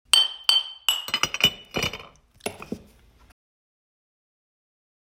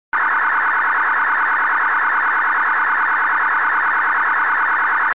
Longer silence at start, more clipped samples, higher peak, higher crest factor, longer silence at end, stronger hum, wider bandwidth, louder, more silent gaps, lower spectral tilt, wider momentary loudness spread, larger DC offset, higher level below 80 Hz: about the same, 0.15 s vs 0.1 s; neither; first, 0 dBFS vs -10 dBFS; first, 28 dB vs 6 dB; first, 2.4 s vs 0.05 s; neither; first, 16 kHz vs 4 kHz; second, -22 LUFS vs -16 LUFS; neither; second, -0.5 dB/octave vs -4 dB/octave; first, 20 LU vs 0 LU; second, under 0.1% vs 1%; first, -56 dBFS vs -66 dBFS